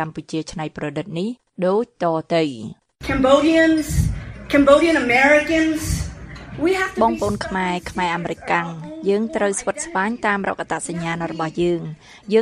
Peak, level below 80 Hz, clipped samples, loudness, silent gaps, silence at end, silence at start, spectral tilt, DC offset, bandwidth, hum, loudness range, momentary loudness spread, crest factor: 0 dBFS; -36 dBFS; under 0.1%; -20 LUFS; none; 0 s; 0 s; -5 dB/octave; under 0.1%; 15.5 kHz; none; 6 LU; 14 LU; 20 dB